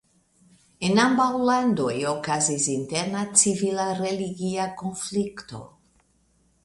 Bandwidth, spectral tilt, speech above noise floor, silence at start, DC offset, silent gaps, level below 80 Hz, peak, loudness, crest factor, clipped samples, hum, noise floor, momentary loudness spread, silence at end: 11.5 kHz; -3.5 dB/octave; 41 dB; 0.8 s; under 0.1%; none; -62 dBFS; -2 dBFS; -23 LUFS; 22 dB; under 0.1%; none; -65 dBFS; 11 LU; 0.95 s